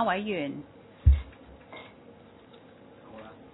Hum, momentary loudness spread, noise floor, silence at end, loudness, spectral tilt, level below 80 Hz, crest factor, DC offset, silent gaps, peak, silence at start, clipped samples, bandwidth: none; 27 LU; -53 dBFS; 0.2 s; -28 LUFS; -5 dB/octave; -34 dBFS; 22 dB; under 0.1%; none; -8 dBFS; 0 s; under 0.1%; 3.9 kHz